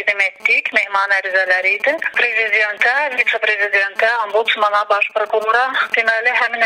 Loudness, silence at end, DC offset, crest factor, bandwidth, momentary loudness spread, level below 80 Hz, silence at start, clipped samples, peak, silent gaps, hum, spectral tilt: -15 LUFS; 0 s; under 0.1%; 16 dB; 16 kHz; 3 LU; -68 dBFS; 0 s; under 0.1%; 0 dBFS; none; none; -0.5 dB/octave